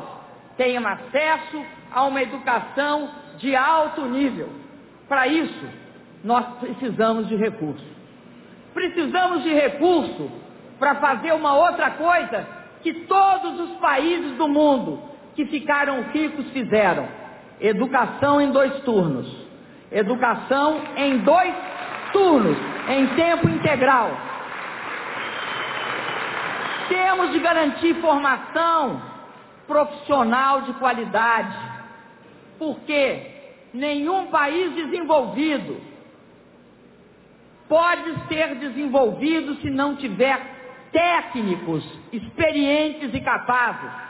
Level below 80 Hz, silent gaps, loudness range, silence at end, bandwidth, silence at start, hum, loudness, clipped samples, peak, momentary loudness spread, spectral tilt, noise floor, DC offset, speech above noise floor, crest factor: -58 dBFS; none; 4 LU; 0 s; 4 kHz; 0 s; none; -21 LUFS; under 0.1%; -4 dBFS; 14 LU; -9 dB/octave; -50 dBFS; under 0.1%; 30 dB; 18 dB